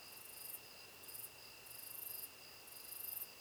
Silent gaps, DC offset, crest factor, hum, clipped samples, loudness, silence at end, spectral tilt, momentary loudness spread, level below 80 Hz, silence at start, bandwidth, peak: none; under 0.1%; 22 dB; none; under 0.1%; -49 LUFS; 0 s; -0.5 dB/octave; 8 LU; -82 dBFS; 0 s; over 20 kHz; -30 dBFS